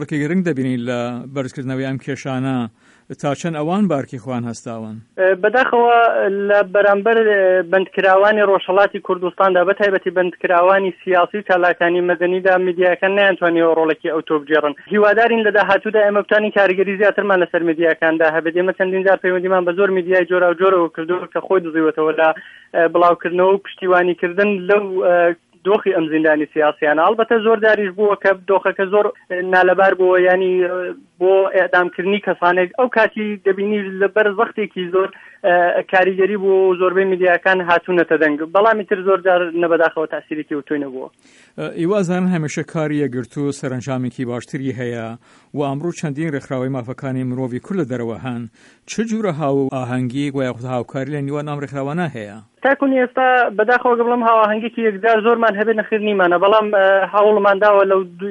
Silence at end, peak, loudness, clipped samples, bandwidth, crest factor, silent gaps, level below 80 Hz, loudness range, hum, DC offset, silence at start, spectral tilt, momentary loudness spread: 0 s; 0 dBFS; -16 LUFS; under 0.1%; 10.5 kHz; 16 dB; none; -64 dBFS; 8 LU; none; under 0.1%; 0 s; -6.5 dB/octave; 11 LU